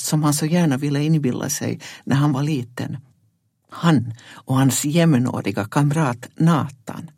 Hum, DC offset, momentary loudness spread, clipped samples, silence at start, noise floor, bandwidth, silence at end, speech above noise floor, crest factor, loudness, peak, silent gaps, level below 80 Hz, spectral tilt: none; under 0.1%; 13 LU; under 0.1%; 0 s; -65 dBFS; 16.5 kHz; 0.1 s; 45 dB; 18 dB; -20 LUFS; -2 dBFS; none; -60 dBFS; -5.5 dB/octave